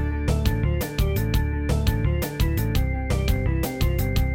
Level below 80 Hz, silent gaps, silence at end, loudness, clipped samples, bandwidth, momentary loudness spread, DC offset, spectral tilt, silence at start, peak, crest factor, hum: -26 dBFS; none; 0 s; -24 LUFS; under 0.1%; 17 kHz; 2 LU; under 0.1%; -6 dB/octave; 0 s; -8 dBFS; 14 dB; none